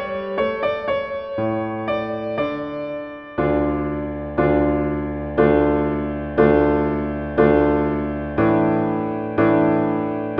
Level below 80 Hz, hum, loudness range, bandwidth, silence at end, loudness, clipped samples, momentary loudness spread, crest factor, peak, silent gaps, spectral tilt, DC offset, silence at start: -36 dBFS; none; 5 LU; 5.6 kHz; 0 s; -20 LUFS; under 0.1%; 9 LU; 18 dB; -2 dBFS; none; -10.5 dB/octave; under 0.1%; 0 s